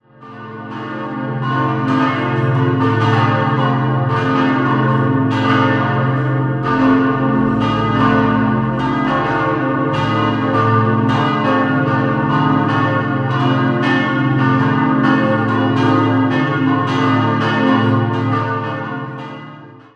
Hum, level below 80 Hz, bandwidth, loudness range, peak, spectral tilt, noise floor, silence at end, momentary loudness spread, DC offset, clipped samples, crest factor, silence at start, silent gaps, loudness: none; -44 dBFS; 7.4 kHz; 2 LU; -2 dBFS; -8 dB/octave; -36 dBFS; 0.2 s; 7 LU; under 0.1%; under 0.1%; 14 dB; 0.2 s; none; -15 LUFS